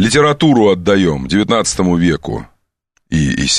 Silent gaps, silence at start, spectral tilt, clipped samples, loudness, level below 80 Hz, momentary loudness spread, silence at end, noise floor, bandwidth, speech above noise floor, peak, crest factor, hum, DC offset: none; 0 s; -4.5 dB/octave; under 0.1%; -13 LUFS; -34 dBFS; 10 LU; 0 s; -64 dBFS; 12.5 kHz; 51 dB; 0 dBFS; 12 dB; none; 0.3%